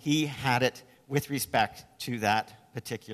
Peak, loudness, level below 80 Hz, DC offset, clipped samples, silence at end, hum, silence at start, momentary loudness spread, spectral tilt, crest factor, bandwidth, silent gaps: -10 dBFS; -29 LUFS; -62 dBFS; under 0.1%; under 0.1%; 0 s; none; 0.05 s; 12 LU; -4.5 dB/octave; 20 dB; 14 kHz; none